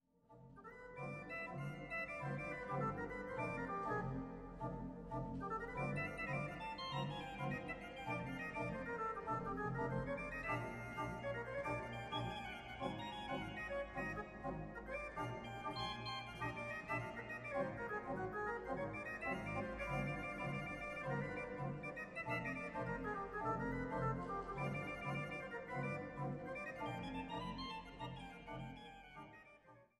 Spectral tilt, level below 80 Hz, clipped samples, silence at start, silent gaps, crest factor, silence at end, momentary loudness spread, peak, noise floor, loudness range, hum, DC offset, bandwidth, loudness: -6.5 dB/octave; -62 dBFS; under 0.1%; 0.3 s; none; 18 dB; 0.15 s; 7 LU; -28 dBFS; -66 dBFS; 2 LU; none; under 0.1%; 13.5 kHz; -45 LUFS